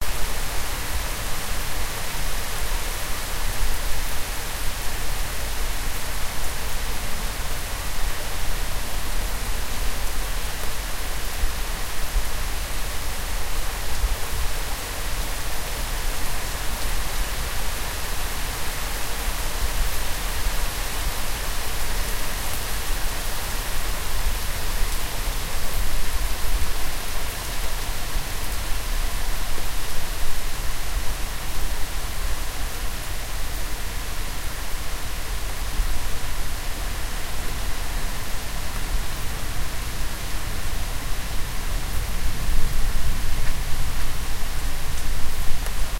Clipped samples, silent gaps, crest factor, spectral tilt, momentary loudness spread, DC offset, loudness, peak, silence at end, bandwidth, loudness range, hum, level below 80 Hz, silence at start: under 0.1%; none; 16 dB; -2.5 dB/octave; 3 LU; under 0.1%; -29 LUFS; -4 dBFS; 0 s; 16 kHz; 3 LU; none; -26 dBFS; 0 s